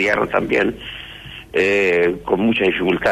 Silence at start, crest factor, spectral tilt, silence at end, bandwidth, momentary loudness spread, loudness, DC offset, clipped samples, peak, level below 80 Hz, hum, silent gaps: 0 s; 16 dB; -5.5 dB/octave; 0 s; 13.5 kHz; 16 LU; -17 LUFS; under 0.1%; under 0.1%; -4 dBFS; -46 dBFS; none; none